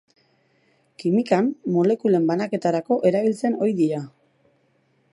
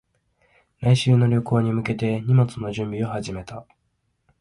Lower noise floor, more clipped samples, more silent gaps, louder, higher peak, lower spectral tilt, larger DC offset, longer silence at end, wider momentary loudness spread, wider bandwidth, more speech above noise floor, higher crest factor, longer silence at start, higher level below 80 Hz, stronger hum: second, -64 dBFS vs -71 dBFS; neither; neither; about the same, -22 LUFS vs -22 LUFS; about the same, -4 dBFS vs -6 dBFS; about the same, -7.5 dB/octave vs -7.5 dB/octave; neither; first, 1.05 s vs 0.8 s; second, 4 LU vs 15 LU; about the same, 11.5 kHz vs 11.5 kHz; second, 44 dB vs 50 dB; about the same, 18 dB vs 16 dB; first, 1 s vs 0.8 s; second, -74 dBFS vs -52 dBFS; neither